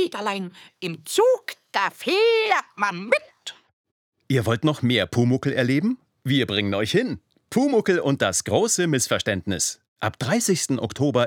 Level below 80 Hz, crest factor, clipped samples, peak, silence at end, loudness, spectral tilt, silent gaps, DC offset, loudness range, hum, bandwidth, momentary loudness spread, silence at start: -62 dBFS; 18 dB; under 0.1%; -6 dBFS; 0 s; -22 LUFS; -4 dB/octave; 3.73-3.84 s, 3.91-4.12 s, 9.88-9.96 s; under 0.1%; 2 LU; none; 19 kHz; 10 LU; 0 s